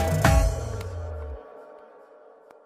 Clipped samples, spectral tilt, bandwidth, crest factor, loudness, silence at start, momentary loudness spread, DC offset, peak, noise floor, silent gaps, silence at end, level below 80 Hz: under 0.1%; -5.5 dB/octave; 16 kHz; 20 dB; -26 LUFS; 0 s; 25 LU; under 0.1%; -6 dBFS; -51 dBFS; none; 0.8 s; -30 dBFS